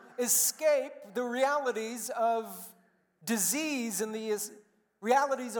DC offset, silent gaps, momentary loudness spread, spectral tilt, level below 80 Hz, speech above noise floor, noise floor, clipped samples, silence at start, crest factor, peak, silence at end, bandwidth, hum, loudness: under 0.1%; none; 14 LU; -2 dB/octave; under -90 dBFS; 33 dB; -63 dBFS; under 0.1%; 0 s; 20 dB; -12 dBFS; 0 s; 19 kHz; none; -30 LUFS